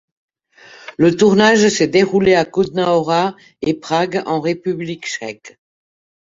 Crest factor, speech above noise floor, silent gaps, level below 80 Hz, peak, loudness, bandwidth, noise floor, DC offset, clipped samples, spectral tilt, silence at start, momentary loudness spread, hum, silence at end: 16 dB; 30 dB; none; -54 dBFS; -2 dBFS; -16 LUFS; 7.8 kHz; -45 dBFS; under 0.1%; under 0.1%; -5 dB/octave; 0.85 s; 13 LU; none; 0.7 s